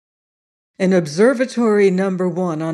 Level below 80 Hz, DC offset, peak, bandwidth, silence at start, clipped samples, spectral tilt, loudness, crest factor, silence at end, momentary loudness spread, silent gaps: -70 dBFS; under 0.1%; -4 dBFS; 11.5 kHz; 0.8 s; under 0.1%; -6.5 dB/octave; -17 LUFS; 14 dB; 0 s; 6 LU; none